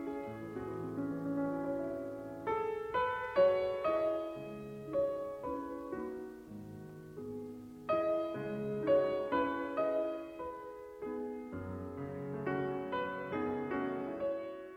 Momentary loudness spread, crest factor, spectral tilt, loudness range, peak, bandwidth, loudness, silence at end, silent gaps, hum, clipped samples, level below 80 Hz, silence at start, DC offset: 14 LU; 18 dB; -7.5 dB/octave; 6 LU; -18 dBFS; 15.5 kHz; -37 LUFS; 0 s; none; none; under 0.1%; -66 dBFS; 0 s; under 0.1%